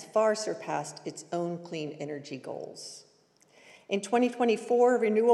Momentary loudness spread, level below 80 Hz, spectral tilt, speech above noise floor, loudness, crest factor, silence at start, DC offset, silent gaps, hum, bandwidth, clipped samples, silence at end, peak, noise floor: 17 LU; under -90 dBFS; -4.5 dB/octave; 35 dB; -29 LUFS; 18 dB; 0 s; under 0.1%; none; none; 12 kHz; under 0.1%; 0 s; -12 dBFS; -63 dBFS